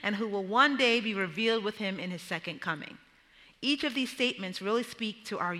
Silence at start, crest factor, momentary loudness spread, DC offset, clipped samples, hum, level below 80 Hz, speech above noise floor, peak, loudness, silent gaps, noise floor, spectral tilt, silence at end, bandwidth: 0 s; 22 dB; 11 LU; under 0.1%; under 0.1%; none; -74 dBFS; 29 dB; -10 dBFS; -30 LUFS; none; -60 dBFS; -4 dB/octave; 0 s; 15 kHz